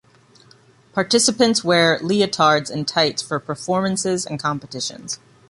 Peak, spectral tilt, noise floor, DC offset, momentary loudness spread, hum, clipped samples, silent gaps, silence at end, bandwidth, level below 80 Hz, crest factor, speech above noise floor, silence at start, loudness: -4 dBFS; -3.5 dB/octave; -52 dBFS; under 0.1%; 11 LU; none; under 0.1%; none; 0.35 s; 11.5 kHz; -60 dBFS; 18 dB; 32 dB; 0.95 s; -19 LUFS